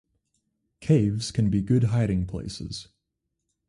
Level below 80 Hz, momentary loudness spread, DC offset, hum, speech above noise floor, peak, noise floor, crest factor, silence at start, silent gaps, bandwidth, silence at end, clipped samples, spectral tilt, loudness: -46 dBFS; 14 LU; under 0.1%; none; 57 dB; -10 dBFS; -81 dBFS; 18 dB; 0.8 s; none; 11.5 kHz; 0.85 s; under 0.1%; -7 dB/octave; -25 LUFS